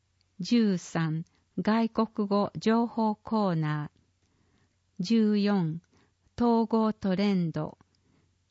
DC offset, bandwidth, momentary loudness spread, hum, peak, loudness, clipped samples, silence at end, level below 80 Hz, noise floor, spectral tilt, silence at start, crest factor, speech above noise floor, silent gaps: under 0.1%; 8 kHz; 12 LU; none; -14 dBFS; -28 LUFS; under 0.1%; 0.8 s; -66 dBFS; -69 dBFS; -7 dB/octave; 0.4 s; 16 dB; 43 dB; none